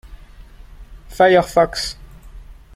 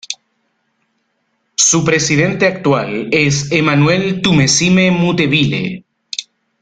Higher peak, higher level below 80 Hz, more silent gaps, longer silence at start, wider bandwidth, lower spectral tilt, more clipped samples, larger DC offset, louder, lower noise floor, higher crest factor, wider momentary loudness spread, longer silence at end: about the same, -2 dBFS vs 0 dBFS; first, -38 dBFS vs -46 dBFS; neither; about the same, 0.1 s vs 0.1 s; first, 16 kHz vs 9.6 kHz; about the same, -4.5 dB/octave vs -4 dB/octave; neither; neither; second, -16 LUFS vs -13 LUFS; second, -40 dBFS vs -66 dBFS; about the same, 18 dB vs 14 dB; first, 24 LU vs 15 LU; second, 0.2 s vs 0.4 s